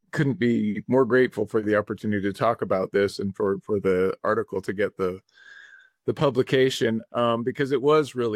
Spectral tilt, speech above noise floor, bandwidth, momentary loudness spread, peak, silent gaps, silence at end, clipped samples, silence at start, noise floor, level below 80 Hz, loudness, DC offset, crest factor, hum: -6.5 dB/octave; 27 dB; 13.5 kHz; 7 LU; -8 dBFS; none; 0 s; under 0.1%; 0.15 s; -51 dBFS; -64 dBFS; -24 LUFS; under 0.1%; 16 dB; none